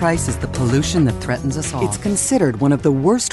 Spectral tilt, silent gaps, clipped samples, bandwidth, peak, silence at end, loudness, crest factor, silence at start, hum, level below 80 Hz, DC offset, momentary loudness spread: -5 dB/octave; none; under 0.1%; 12 kHz; -4 dBFS; 0 s; -18 LUFS; 14 dB; 0 s; none; -34 dBFS; under 0.1%; 6 LU